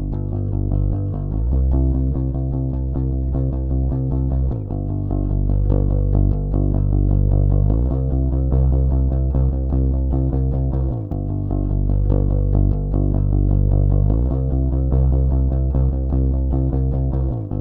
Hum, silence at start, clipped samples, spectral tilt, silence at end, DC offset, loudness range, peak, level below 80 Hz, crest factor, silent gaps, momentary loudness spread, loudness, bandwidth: none; 0 s; under 0.1%; -14 dB/octave; 0 s; under 0.1%; 3 LU; -6 dBFS; -20 dBFS; 12 dB; none; 5 LU; -20 LUFS; 1.6 kHz